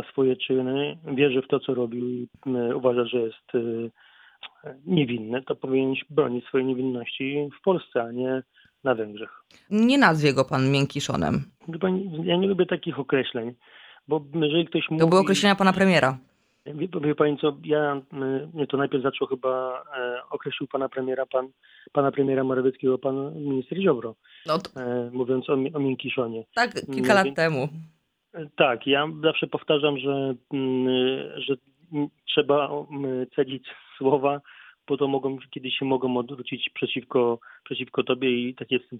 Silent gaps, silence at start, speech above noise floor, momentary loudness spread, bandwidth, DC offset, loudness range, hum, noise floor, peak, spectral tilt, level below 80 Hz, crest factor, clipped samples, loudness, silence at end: none; 0 s; 23 dB; 11 LU; 12.5 kHz; under 0.1%; 5 LU; none; -47 dBFS; -2 dBFS; -6 dB/octave; -64 dBFS; 22 dB; under 0.1%; -25 LUFS; 0 s